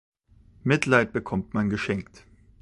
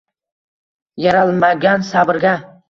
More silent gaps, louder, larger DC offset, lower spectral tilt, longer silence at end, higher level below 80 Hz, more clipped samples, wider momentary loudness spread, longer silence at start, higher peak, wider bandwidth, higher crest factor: neither; second, -25 LUFS vs -14 LUFS; neither; about the same, -6 dB/octave vs -6.5 dB/octave; first, 0.6 s vs 0.25 s; about the same, -52 dBFS vs -56 dBFS; neither; first, 10 LU vs 4 LU; second, 0.65 s vs 0.95 s; about the same, -4 dBFS vs -2 dBFS; first, 11 kHz vs 7.4 kHz; first, 24 dB vs 14 dB